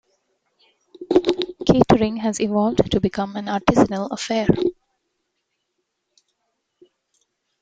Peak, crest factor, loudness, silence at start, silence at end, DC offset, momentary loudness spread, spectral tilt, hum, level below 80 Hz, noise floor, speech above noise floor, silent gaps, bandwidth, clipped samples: 0 dBFS; 22 dB; -20 LUFS; 1 s; 2.9 s; under 0.1%; 7 LU; -6 dB/octave; none; -46 dBFS; -76 dBFS; 57 dB; none; 9.2 kHz; under 0.1%